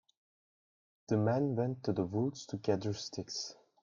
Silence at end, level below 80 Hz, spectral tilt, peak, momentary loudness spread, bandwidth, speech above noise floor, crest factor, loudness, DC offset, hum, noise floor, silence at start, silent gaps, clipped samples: 0.3 s; -70 dBFS; -6 dB/octave; -16 dBFS; 9 LU; 7.4 kHz; over 56 dB; 20 dB; -35 LUFS; under 0.1%; none; under -90 dBFS; 1.1 s; none; under 0.1%